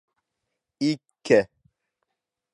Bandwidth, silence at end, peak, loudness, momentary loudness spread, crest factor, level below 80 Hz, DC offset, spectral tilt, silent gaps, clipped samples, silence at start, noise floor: 11 kHz; 1.1 s; -4 dBFS; -24 LUFS; 12 LU; 24 dB; -66 dBFS; under 0.1%; -5.5 dB/octave; none; under 0.1%; 0.8 s; -83 dBFS